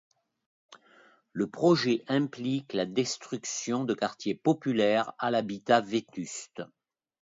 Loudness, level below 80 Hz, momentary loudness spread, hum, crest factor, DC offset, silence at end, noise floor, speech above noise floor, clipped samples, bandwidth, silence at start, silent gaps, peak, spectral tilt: -29 LUFS; -74 dBFS; 13 LU; none; 20 dB; under 0.1%; 0.65 s; -60 dBFS; 32 dB; under 0.1%; 7.8 kHz; 0.7 s; none; -10 dBFS; -5 dB/octave